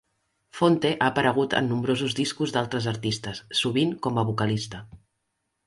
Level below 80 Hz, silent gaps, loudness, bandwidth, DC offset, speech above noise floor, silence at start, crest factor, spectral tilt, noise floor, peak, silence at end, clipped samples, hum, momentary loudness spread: -58 dBFS; none; -25 LUFS; 11.5 kHz; under 0.1%; 53 dB; 0.55 s; 20 dB; -5 dB/octave; -78 dBFS; -6 dBFS; 0.7 s; under 0.1%; none; 8 LU